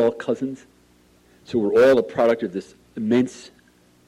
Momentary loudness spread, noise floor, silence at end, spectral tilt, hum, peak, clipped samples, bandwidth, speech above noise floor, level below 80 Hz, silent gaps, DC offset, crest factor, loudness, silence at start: 19 LU; -56 dBFS; 0.6 s; -6.5 dB/octave; none; -8 dBFS; under 0.1%; 13 kHz; 35 dB; -62 dBFS; none; under 0.1%; 14 dB; -21 LUFS; 0 s